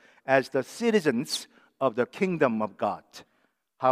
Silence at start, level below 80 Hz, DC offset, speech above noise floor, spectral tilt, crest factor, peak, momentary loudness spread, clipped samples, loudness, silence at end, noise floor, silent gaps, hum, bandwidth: 0.25 s; -80 dBFS; under 0.1%; 45 dB; -5 dB/octave; 22 dB; -6 dBFS; 7 LU; under 0.1%; -27 LUFS; 0 s; -71 dBFS; none; none; 15.5 kHz